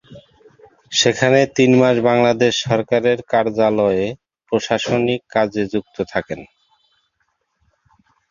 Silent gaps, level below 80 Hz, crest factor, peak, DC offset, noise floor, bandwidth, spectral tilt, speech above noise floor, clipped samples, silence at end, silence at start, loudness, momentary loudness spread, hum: none; -54 dBFS; 18 dB; 0 dBFS; under 0.1%; -69 dBFS; 7.4 kHz; -4.5 dB/octave; 52 dB; under 0.1%; 1.85 s; 0.1 s; -17 LUFS; 10 LU; none